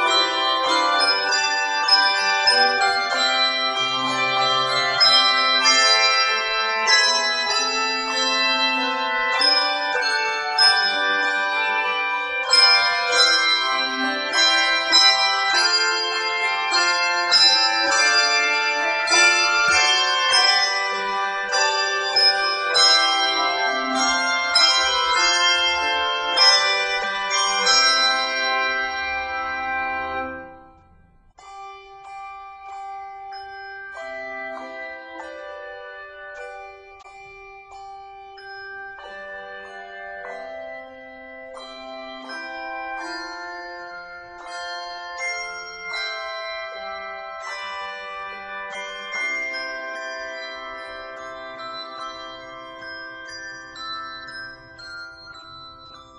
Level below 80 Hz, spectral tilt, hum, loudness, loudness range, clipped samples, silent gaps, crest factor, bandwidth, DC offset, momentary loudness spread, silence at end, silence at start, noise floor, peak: -60 dBFS; 0.5 dB/octave; none; -17 LUFS; 20 LU; under 0.1%; none; 20 dB; 12 kHz; under 0.1%; 22 LU; 0 s; 0 s; -53 dBFS; -2 dBFS